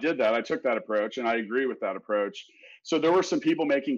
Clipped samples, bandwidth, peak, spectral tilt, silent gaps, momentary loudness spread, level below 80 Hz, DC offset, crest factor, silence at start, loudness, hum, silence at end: under 0.1%; 7.6 kHz; -16 dBFS; -4.5 dB/octave; none; 8 LU; -74 dBFS; under 0.1%; 12 dB; 0 s; -27 LUFS; none; 0 s